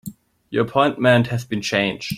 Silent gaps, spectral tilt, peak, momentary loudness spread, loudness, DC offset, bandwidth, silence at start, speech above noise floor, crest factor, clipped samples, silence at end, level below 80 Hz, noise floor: none; -5.5 dB/octave; -2 dBFS; 9 LU; -19 LUFS; under 0.1%; 16 kHz; 0.05 s; 20 dB; 20 dB; under 0.1%; 0 s; -56 dBFS; -39 dBFS